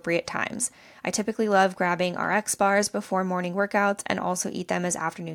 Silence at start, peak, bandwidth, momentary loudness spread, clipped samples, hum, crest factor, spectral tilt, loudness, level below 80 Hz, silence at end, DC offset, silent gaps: 0.05 s; -8 dBFS; 17.5 kHz; 7 LU; under 0.1%; none; 18 dB; -4 dB/octave; -25 LUFS; -66 dBFS; 0 s; under 0.1%; none